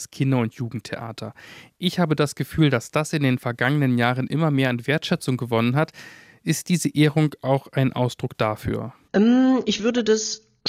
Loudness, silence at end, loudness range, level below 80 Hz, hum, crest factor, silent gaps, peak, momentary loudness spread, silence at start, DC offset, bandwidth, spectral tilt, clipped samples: -22 LUFS; 0 s; 2 LU; -56 dBFS; none; 16 dB; none; -6 dBFS; 11 LU; 0 s; under 0.1%; 15.5 kHz; -5.5 dB/octave; under 0.1%